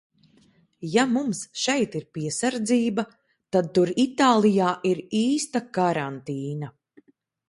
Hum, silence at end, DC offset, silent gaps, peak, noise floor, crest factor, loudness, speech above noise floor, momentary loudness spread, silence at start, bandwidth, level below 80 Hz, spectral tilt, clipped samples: none; 0.8 s; under 0.1%; none; -6 dBFS; -60 dBFS; 18 dB; -24 LUFS; 37 dB; 12 LU; 0.8 s; 11.5 kHz; -68 dBFS; -5 dB/octave; under 0.1%